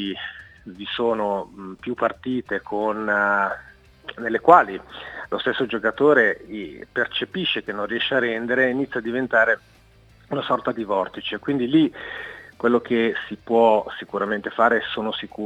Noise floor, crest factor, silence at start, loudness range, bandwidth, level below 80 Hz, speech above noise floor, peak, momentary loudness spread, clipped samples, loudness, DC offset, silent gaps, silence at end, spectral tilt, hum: -52 dBFS; 22 dB; 0 s; 4 LU; 9 kHz; -58 dBFS; 30 dB; 0 dBFS; 17 LU; under 0.1%; -22 LUFS; under 0.1%; none; 0 s; -6.5 dB/octave; none